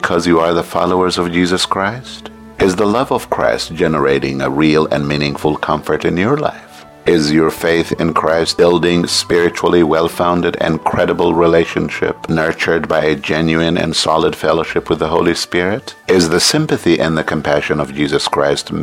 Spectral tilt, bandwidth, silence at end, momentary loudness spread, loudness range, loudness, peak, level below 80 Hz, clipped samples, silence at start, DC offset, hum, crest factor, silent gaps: -4.5 dB/octave; 16.5 kHz; 0 s; 6 LU; 2 LU; -14 LUFS; 0 dBFS; -40 dBFS; under 0.1%; 0 s; under 0.1%; none; 14 dB; none